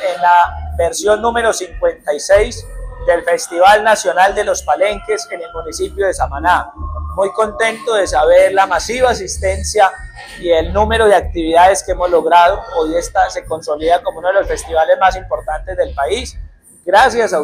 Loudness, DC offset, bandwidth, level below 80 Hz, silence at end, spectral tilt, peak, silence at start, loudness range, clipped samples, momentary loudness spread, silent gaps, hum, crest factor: -14 LUFS; under 0.1%; 15.5 kHz; -30 dBFS; 0 s; -3.5 dB/octave; 0 dBFS; 0 s; 4 LU; under 0.1%; 12 LU; none; none; 14 dB